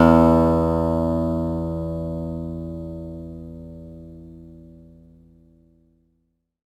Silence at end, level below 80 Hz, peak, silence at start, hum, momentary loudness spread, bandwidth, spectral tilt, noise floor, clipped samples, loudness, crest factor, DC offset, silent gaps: 1.9 s; -38 dBFS; 0 dBFS; 0 s; none; 25 LU; 12.5 kHz; -9.5 dB/octave; -71 dBFS; under 0.1%; -22 LUFS; 22 dB; under 0.1%; none